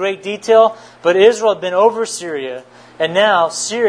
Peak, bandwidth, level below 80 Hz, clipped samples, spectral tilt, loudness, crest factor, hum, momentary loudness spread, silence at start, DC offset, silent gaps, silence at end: 0 dBFS; 10.5 kHz; -64 dBFS; under 0.1%; -3 dB/octave; -14 LUFS; 14 dB; none; 12 LU; 0 s; under 0.1%; none; 0 s